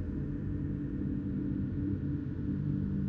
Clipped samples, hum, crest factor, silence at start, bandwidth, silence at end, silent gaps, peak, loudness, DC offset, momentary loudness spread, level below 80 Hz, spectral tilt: under 0.1%; none; 12 dB; 0 s; 4.2 kHz; 0 s; none; -22 dBFS; -35 LUFS; under 0.1%; 3 LU; -44 dBFS; -11.5 dB/octave